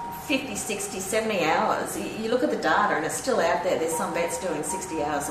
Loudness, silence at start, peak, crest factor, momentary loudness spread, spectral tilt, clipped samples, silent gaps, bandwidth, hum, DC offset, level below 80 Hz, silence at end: -26 LUFS; 0 s; -8 dBFS; 18 dB; 7 LU; -3 dB/octave; under 0.1%; none; 14.5 kHz; none; under 0.1%; -56 dBFS; 0 s